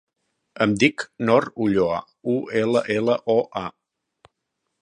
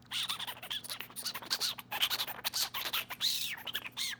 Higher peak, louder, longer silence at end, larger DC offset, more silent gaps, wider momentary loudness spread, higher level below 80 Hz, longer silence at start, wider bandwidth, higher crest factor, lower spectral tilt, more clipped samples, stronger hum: first, -2 dBFS vs -12 dBFS; first, -22 LUFS vs -34 LUFS; first, 1.1 s vs 0 s; neither; neither; about the same, 8 LU vs 7 LU; first, -58 dBFS vs -72 dBFS; first, 0.55 s vs 0 s; second, 10.5 kHz vs over 20 kHz; about the same, 22 dB vs 24 dB; first, -6 dB/octave vs 0.5 dB/octave; neither; neither